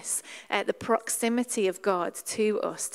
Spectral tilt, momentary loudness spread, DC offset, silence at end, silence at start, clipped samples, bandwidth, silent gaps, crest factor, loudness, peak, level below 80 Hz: -3 dB/octave; 4 LU; under 0.1%; 0 s; 0 s; under 0.1%; 16 kHz; none; 20 dB; -28 LUFS; -8 dBFS; -72 dBFS